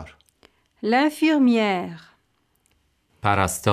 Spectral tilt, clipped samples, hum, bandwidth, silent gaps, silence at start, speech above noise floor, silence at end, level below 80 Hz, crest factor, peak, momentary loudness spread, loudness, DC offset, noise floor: -5 dB/octave; under 0.1%; none; 15.5 kHz; none; 0 s; 48 dB; 0 s; -54 dBFS; 20 dB; -4 dBFS; 13 LU; -21 LUFS; under 0.1%; -68 dBFS